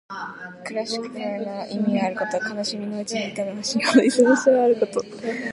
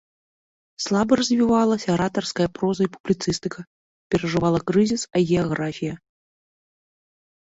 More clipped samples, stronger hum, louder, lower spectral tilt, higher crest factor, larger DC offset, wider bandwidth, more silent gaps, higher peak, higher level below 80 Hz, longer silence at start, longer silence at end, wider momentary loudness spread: neither; neither; about the same, -22 LUFS vs -22 LUFS; second, -4 dB/octave vs -5.5 dB/octave; about the same, 18 dB vs 18 dB; neither; first, 11.5 kHz vs 8 kHz; second, none vs 3.00-3.04 s, 3.67-4.10 s; about the same, -4 dBFS vs -6 dBFS; second, -68 dBFS vs -52 dBFS; second, 0.1 s vs 0.8 s; second, 0 s vs 1.6 s; about the same, 13 LU vs 11 LU